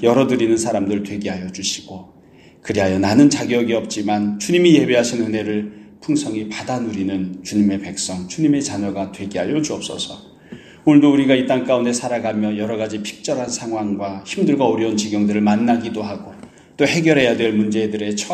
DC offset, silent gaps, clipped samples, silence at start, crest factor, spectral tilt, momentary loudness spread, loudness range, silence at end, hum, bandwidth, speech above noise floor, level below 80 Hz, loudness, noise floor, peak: under 0.1%; none; under 0.1%; 0 s; 18 dB; -5 dB/octave; 12 LU; 5 LU; 0 s; none; 13 kHz; 22 dB; -56 dBFS; -18 LUFS; -40 dBFS; 0 dBFS